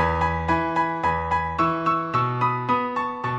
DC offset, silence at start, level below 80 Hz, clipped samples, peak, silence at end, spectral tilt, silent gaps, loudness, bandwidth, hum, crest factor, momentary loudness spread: under 0.1%; 0 s; -40 dBFS; under 0.1%; -8 dBFS; 0 s; -7 dB/octave; none; -23 LUFS; 8.4 kHz; none; 16 dB; 2 LU